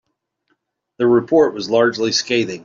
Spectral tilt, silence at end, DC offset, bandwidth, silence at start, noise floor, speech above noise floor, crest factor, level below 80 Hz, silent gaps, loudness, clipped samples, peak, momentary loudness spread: -4 dB/octave; 0.05 s; under 0.1%; 7.6 kHz; 1 s; -69 dBFS; 53 dB; 16 dB; -60 dBFS; none; -16 LUFS; under 0.1%; -2 dBFS; 5 LU